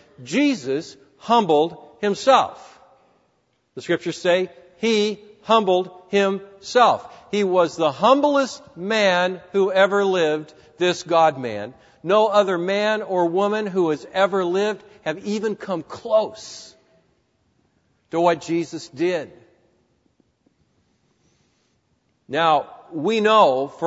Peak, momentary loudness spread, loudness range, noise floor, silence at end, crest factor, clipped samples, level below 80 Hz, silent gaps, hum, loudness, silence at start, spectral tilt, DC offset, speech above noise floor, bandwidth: -2 dBFS; 13 LU; 8 LU; -67 dBFS; 0 s; 18 dB; under 0.1%; -68 dBFS; none; none; -20 LUFS; 0.2 s; -4.5 dB/octave; under 0.1%; 47 dB; 8 kHz